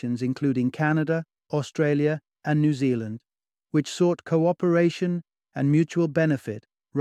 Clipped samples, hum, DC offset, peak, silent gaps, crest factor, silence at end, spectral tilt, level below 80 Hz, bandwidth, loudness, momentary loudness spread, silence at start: under 0.1%; none; under 0.1%; -8 dBFS; none; 16 dB; 0 s; -7.5 dB/octave; -68 dBFS; 10.5 kHz; -25 LUFS; 10 LU; 0.05 s